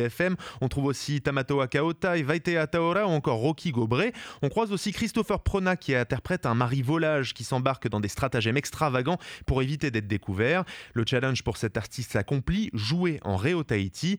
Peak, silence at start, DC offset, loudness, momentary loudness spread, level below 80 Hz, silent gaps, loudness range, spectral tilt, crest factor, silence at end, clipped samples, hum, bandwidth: -8 dBFS; 0 s; under 0.1%; -27 LUFS; 5 LU; -46 dBFS; none; 2 LU; -6 dB/octave; 18 dB; 0 s; under 0.1%; none; over 20 kHz